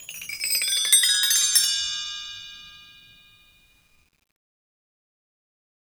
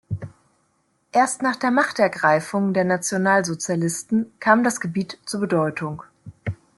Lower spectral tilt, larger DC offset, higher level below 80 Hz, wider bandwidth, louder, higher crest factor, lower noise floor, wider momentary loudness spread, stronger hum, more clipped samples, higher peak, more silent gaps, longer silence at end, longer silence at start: second, 4.5 dB/octave vs -5 dB/octave; neither; about the same, -64 dBFS vs -60 dBFS; first, over 20 kHz vs 12.5 kHz; about the same, -19 LUFS vs -21 LUFS; about the same, 24 dB vs 20 dB; second, -60 dBFS vs -67 dBFS; first, 20 LU vs 14 LU; neither; neither; about the same, -2 dBFS vs -2 dBFS; neither; first, 3.1 s vs 0.25 s; about the same, 0 s vs 0.1 s